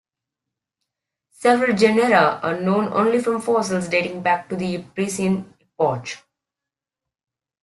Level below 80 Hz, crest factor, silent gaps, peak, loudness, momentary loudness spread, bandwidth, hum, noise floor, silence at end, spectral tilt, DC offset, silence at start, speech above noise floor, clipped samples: -62 dBFS; 20 dB; none; -2 dBFS; -20 LUFS; 10 LU; 12.5 kHz; none; -88 dBFS; 1.45 s; -5.5 dB/octave; under 0.1%; 1.4 s; 68 dB; under 0.1%